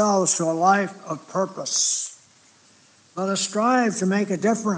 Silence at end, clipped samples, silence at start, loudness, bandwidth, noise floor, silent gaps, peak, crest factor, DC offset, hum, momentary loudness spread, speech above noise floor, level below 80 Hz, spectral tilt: 0 s; under 0.1%; 0 s; -22 LUFS; 10 kHz; -55 dBFS; none; -6 dBFS; 16 dB; under 0.1%; none; 10 LU; 34 dB; -84 dBFS; -3.5 dB/octave